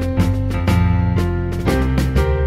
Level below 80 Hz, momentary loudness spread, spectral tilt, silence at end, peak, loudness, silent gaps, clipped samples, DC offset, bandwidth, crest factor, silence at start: -22 dBFS; 3 LU; -7.5 dB/octave; 0 s; -4 dBFS; -18 LUFS; none; under 0.1%; under 0.1%; 15 kHz; 12 dB; 0 s